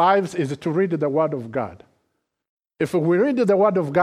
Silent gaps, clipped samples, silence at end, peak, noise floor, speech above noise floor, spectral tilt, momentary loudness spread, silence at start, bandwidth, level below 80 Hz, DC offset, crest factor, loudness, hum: 2.49-2.57 s; under 0.1%; 0 s; -4 dBFS; -74 dBFS; 54 dB; -7.5 dB/octave; 10 LU; 0 s; 13.5 kHz; -64 dBFS; under 0.1%; 16 dB; -21 LUFS; none